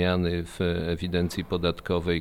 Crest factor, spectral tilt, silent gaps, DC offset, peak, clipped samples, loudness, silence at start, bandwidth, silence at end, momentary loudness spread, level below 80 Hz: 16 dB; -6.5 dB/octave; none; under 0.1%; -10 dBFS; under 0.1%; -28 LUFS; 0 s; 15 kHz; 0 s; 2 LU; -44 dBFS